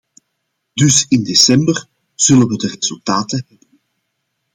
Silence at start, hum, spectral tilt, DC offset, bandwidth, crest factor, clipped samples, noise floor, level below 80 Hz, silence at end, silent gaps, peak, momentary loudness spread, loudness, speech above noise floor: 0.75 s; none; -3.5 dB/octave; under 0.1%; 16.5 kHz; 16 dB; under 0.1%; -72 dBFS; -54 dBFS; 1.15 s; none; 0 dBFS; 13 LU; -13 LUFS; 58 dB